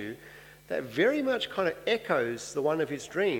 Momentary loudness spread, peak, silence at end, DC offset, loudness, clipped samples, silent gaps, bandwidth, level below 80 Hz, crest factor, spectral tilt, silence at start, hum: 11 LU; -12 dBFS; 0 s; under 0.1%; -29 LUFS; under 0.1%; none; 19 kHz; -66 dBFS; 18 dB; -4.5 dB/octave; 0 s; 50 Hz at -60 dBFS